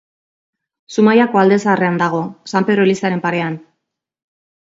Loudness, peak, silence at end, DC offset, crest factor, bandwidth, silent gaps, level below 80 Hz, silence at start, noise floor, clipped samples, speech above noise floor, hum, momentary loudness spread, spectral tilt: -15 LUFS; 0 dBFS; 1.2 s; under 0.1%; 16 dB; 7.8 kHz; none; -64 dBFS; 0.9 s; -76 dBFS; under 0.1%; 61 dB; none; 11 LU; -6.5 dB/octave